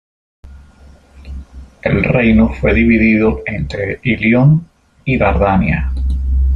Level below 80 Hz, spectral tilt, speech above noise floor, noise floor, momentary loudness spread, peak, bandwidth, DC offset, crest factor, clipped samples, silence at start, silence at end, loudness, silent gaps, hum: -22 dBFS; -9.5 dB/octave; 30 dB; -42 dBFS; 12 LU; -2 dBFS; 7.4 kHz; under 0.1%; 12 dB; under 0.1%; 0.45 s; 0 s; -13 LUFS; none; none